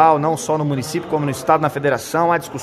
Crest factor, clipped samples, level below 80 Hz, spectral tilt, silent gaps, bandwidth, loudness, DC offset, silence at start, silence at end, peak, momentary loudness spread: 18 dB; under 0.1%; -54 dBFS; -5.5 dB/octave; none; 14 kHz; -19 LUFS; under 0.1%; 0 s; 0 s; 0 dBFS; 5 LU